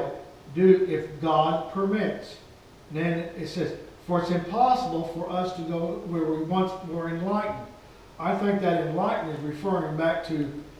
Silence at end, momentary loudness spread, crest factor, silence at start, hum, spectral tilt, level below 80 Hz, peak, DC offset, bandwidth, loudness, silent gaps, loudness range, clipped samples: 0 s; 11 LU; 20 dB; 0 s; none; -7.5 dB/octave; -56 dBFS; -6 dBFS; under 0.1%; 12.5 kHz; -27 LUFS; none; 4 LU; under 0.1%